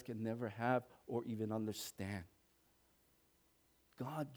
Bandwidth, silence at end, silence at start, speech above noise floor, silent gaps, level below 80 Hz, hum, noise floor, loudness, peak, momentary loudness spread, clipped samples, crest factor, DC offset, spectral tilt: over 20 kHz; 0 s; 0 s; 33 dB; none; -78 dBFS; none; -75 dBFS; -43 LUFS; -22 dBFS; 10 LU; under 0.1%; 22 dB; under 0.1%; -6 dB/octave